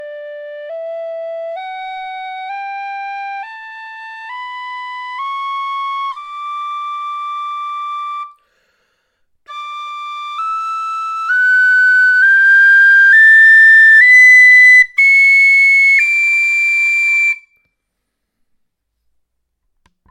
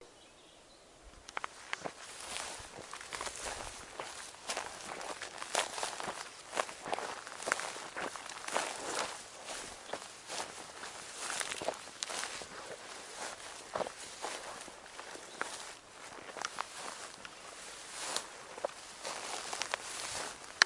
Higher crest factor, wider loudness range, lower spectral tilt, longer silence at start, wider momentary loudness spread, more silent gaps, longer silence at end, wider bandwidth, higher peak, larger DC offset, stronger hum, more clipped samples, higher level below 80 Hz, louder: second, 12 dB vs 38 dB; first, 21 LU vs 5 LU; second, 3.5 dB/octave vs -0.5 dB/octave; about the same, 0 s vs 0 s; first, 23 LU vs 10 LU; neither; first, 2.75 s vs 0 s; first, 17 kHz vs 11.5 kHz; about the same, -2 dBFS vs -4 dBFS; neither; neither; neither; about the same, -66 dBFS vs -70 dBFS; first, -7 LUFS vs -41 LUFS